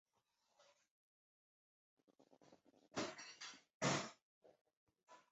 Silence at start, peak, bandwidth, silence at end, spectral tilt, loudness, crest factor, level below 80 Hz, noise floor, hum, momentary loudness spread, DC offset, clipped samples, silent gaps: 2.5 s; -26 dBFS; 8 kHz; 0.15 s; -3 dB/octave; -46 LUFS; 26 dB; -86 dBFS; -85 dBFS; none; 14 LU; under 0.1%; under 0.1%; 3.74-3.80 s, 4.22-4.41 s, 4.61-4.65 s, 4.77-4.87 s, 5.03-5.07 s